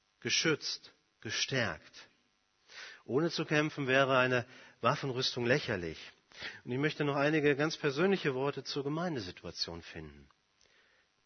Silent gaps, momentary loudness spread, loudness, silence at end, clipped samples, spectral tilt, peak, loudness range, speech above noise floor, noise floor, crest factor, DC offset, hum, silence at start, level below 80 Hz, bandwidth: none; 19 LU; -32 LUFS; 1.05 s; under 0.1%; -4.5 dB/octave; -12 dBFS; 4 LU; 41 dB; -74 dBFS; 22 dB; under 0.1%; none; 0.25 s; -68 dBFS; 6.6 kHz